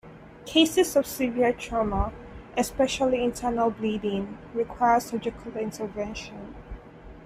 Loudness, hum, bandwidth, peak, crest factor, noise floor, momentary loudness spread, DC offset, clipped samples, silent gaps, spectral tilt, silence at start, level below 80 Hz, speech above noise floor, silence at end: -26 LUFS; none; 15.5 kHz; -6 dBFS; 20 dB; -45 dBFS; 19 LU; under 0.1%; under 0.1%; none; -4.5 dB/octave; 0.05 s; -44 dBFS; 20 dB; 0 s